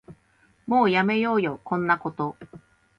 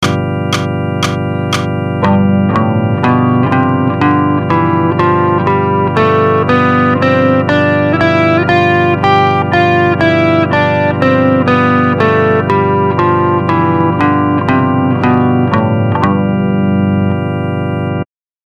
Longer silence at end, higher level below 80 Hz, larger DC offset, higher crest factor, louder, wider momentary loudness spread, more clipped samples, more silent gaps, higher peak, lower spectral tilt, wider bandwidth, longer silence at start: about the same, 0.4 s vs 0.4 s; second, -64 dBFS vs -46 dBFS; neither; first, 18 dB vs 10 dB; second, -24 LUFS vs -11 LUFS; first, 11 LU vs 5 LU; neither; neither; second, -8 dBFS vs 0 dBFS; about the same, -8 dB/octave vs -7.5 dB/octave; second, 7.2 kHz vs 11.5 kHz; about the same, 0.1 s vs 0 s